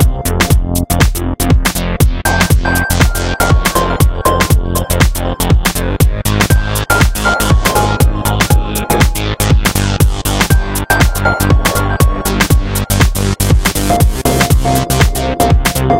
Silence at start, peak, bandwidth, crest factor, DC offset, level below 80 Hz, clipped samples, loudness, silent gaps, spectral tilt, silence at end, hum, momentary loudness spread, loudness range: 0 s; 0 dBFS; 17 kHz; 10 dB; under 0.1%; -16 dBFS; 0.2%; -12 LUFS; none; -4.5 dB/octave; 0 s; none; 3 LU; 1 LU